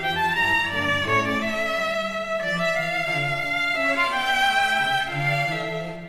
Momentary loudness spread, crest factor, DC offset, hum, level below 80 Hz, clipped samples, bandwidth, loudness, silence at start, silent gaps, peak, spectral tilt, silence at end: 5 LU; 14 dB; under 0.1%; none; -52 dBFS; under 0.1%; 16.5 kHz; -22 LUFS; 0 s; none; -10 dBFS; -4 dB/octave; 0 s